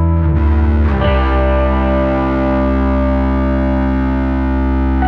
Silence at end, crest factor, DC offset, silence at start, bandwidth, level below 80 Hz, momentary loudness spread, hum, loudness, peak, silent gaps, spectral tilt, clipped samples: 0 s; 10 dB; under 0.1%; 0 s; 4.7 kHz; -16 dBFS; 2 LU; none; -14 LUFS; -2 dBFS; none; -10 dB/octave; under 0.1%